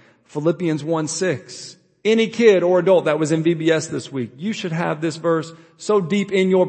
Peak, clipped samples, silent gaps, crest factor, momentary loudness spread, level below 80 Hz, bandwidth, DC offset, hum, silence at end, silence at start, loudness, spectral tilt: -2 dBFS; under 0.1%; none; 18 dB; 14 LU; -68 dBFS; 8.8 kHz; under 0.1%; none; 0 s; 0.35 s; -19 LUFS; -5.5 dB/octave